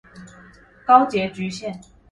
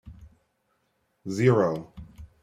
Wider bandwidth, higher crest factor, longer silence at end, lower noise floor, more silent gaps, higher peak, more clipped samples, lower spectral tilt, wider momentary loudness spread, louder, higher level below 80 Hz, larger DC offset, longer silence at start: about the same, 11 kHz vs 10.5 kHz; about the same, 20 dB vs 22 dB; first, 0.35 s vs 0.2 s; second, -48 dBFS vs -73 dBFS; neither; first, -2 dBFS vs -8 dBFS; neither; second, -5.5 dB/octave vs -7.5 dB/octave; second, 18 LU vs 24 LU; first, -19 LUFS vs -25 LUFS; about the same, -56 dBFS vs -54 dBFS; neither; about the same, 0.15 s vs 0.05 s